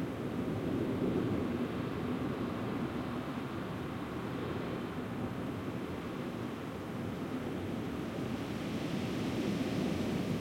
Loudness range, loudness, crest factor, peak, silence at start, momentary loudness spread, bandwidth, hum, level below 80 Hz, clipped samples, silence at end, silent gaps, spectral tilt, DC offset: 3 LU; -37 LUFS; 14 dB; -22 dBFS; 0 s; 5 LU; 16.5 kHz; none; -58 dBFS; under 0.1%; 0 s; none; -7 dB/octave; under 0.1%